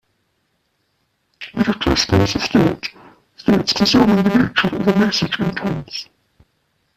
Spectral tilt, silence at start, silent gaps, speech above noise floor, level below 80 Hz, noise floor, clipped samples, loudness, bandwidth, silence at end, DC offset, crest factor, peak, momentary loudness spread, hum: -5 dB/octave; 1.4 s; none; 51 dB; -40 dBFS; -67 dBFS; under 0.1%; -17 LUFS; 14 kHz; 0.95 s; under 0.1%; 16 dB; -2 dBFS; 15 LU; none